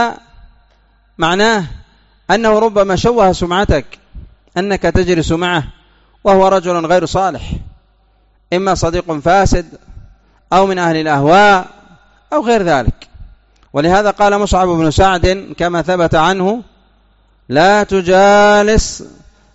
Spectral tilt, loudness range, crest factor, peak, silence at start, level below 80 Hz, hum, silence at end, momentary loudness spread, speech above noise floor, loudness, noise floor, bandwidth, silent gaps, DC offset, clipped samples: -4 dB/octave; 3 LU; 12 dB; 0 dBFS; 0 s; -28 dBFS; none; 0.45 s; 11 LU; 41 dB; -12 LUFS; -53 dBFS; 8 kHz; none; under 0.1%; under 0.1%